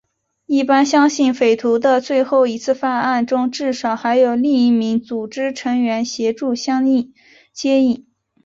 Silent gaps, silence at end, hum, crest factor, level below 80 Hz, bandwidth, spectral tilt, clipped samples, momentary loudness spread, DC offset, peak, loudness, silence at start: none; 0.45 s; none; 14 dB; -62 dBFS; 7.8 kHz; -4 dB/octave; under 0.1%; 8 LU; under 0.1%; -2 dBFS; -17 LUFS; 0.5 s